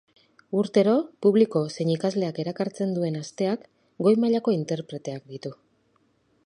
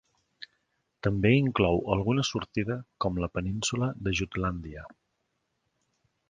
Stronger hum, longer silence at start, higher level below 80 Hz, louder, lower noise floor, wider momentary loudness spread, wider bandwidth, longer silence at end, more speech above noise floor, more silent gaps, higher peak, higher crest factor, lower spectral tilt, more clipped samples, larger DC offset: neither; about the same, 0.5 s vs 0.4 s; second, -74 dBFS vs -48 dBFS; first, -25 LUFS vs -28 LUFS; second, -67 dBFS vs -78 dBFS; second, 14 LU vs 21 LU; about the same, 10.5 kHz vs 9.8 kHz; second, 0.95 s vs 1.4 s; second, 42 dB vs 50 dB; neither; about the same, -8 dBFS vs -8 dBFS; about the same, 18 dB vs 22 dB; first, -7 dB/octave vs -5.5 dB/octave; neither; neither